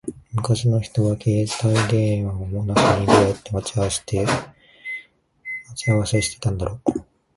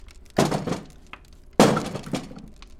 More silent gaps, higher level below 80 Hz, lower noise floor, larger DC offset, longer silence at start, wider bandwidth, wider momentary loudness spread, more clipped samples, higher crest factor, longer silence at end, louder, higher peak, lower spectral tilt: neither; about the same, -42 dBFS vs -46 dBFS; about the same, -46 dBFS vs -45 dBFS; neither; about the same, 0.05 s vs 0.1 s; second, 11.5 kHz vs 16.5 kHz; second, 15 LU vs 25 LU; neither; about the same, 20 dB vs 24 dB; first, 0.35 s vs 0.15 s; first, -21 LUFS vs -24 LUFS; about the same, 0 dBFS vs -2 dBFS; about the same, -5.5 dB/octave vs -5 dB/octave